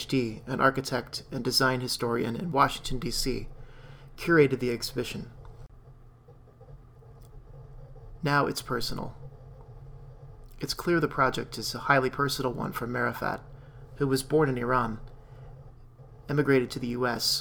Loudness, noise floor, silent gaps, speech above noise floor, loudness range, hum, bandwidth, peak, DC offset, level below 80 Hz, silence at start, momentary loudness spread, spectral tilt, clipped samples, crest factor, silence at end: -28 LUFS; -53 dBFS; none; 26 dB; 6 LU; none; over 20 kHz; -8 dBFS; under 0.1%; -46 dBFS; 0 s; 24 LU; -4.5 dB/octave; under 0.1%; 22 dB; 0 s